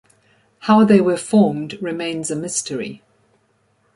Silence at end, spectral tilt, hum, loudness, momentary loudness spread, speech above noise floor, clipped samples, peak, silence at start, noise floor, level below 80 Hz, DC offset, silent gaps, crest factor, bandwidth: 1 s; -5.5 dB/octave; none; -18 LUFS; 15 LU; 45 dB; under 0.1%; -2 dBFS; 0.65 s; -62 dBFS; -62 dBFS; under 0.1%; none; 18 dB; 11.5 kHz